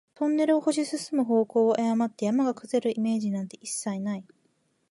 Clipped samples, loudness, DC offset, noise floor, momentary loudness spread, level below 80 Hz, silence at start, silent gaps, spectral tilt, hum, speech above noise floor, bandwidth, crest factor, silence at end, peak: under 0.1%; -27 LUFS; under 0.1%; -70 dBFS; 9 LU; -78 dBFS; 0.2 s; none; -5.5 dB/octave; none; 44 dB; 11.5 kHz; 14 dB; 0.7 s; -12 dBFS